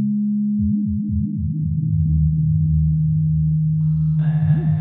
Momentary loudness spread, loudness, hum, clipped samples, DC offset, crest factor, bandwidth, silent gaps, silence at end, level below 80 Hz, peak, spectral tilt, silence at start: 4 LU; -19 LUFS; none; under 0.1%; under 0.1%; 10 dB; 1.9 kHz; none; 0 s; -30 dBFS; -8 dBFS; -13.5 dB/octave; 0 s